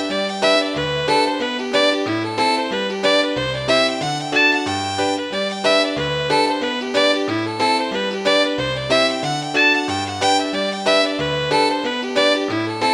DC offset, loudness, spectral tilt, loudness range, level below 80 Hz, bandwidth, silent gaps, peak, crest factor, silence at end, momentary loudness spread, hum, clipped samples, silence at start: under 0.1%; -18 LUFS; -3.5 dB/octave; 1 LU; -50 dBFS; 16 kHz; none; -4 dBFS; 14 dB; 0 s; 6 LU; none; under 0.1%; 0 s